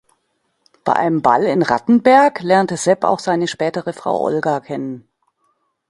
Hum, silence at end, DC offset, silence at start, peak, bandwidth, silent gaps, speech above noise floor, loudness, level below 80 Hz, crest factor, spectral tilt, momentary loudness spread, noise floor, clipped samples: none; 0.9 s; under 0.1%; 0.85 s; 0 dBFS; 11.5 kHz; none; 52 dB; -16 LUFS; -60 dBFS; 18 dB; -5.5 dB/octave; 13 LU; -68 dBFS; under 0.1%